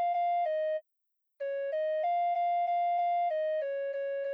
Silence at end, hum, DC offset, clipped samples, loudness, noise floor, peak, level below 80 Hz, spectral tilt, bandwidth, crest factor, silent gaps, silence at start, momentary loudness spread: 0 s; none; under 0.1%; under 0.1%; -31 LUFS; -81 dBFS; -24 dBFS; under -90 dBFS; 0.5 dB/octave; 5.2 kHz; 6 dB; none; 0 s; 6 LU